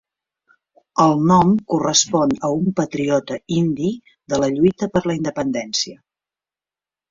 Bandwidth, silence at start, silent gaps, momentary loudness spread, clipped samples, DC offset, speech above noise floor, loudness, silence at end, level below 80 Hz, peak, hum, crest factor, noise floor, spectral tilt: 7.8 kHz; 0.95 s; none; 9 LU; under 0.1%; under 0.1%; over 72 dB; -19 LUFS; 1.15 s; -52 dBFS; -2 dBFS; none; 18 dB; under -90 dBFS; -5 dB/octave